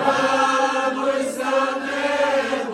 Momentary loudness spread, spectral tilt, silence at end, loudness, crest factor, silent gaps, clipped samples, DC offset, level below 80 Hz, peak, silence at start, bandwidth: 5 LU; -3 dB/octave; 0 s; -20 LUFS; 16 dB; none; under 0.1%; under 0.1%; -68 dBFS; -4 dBFS; 0 s; 13 kHz